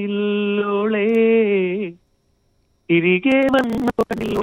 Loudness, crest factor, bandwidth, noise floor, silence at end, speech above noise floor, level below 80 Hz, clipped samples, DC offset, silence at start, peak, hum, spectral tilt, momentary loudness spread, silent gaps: -18 LUFS; 14 dB; 16 kHz; -63 dBFS; 0 s; 46 dB; -50 dBFS; under 0.1%; under 0.1%; 0 s; -6 dBFS; none; -7 dB/octave; 7 LU; none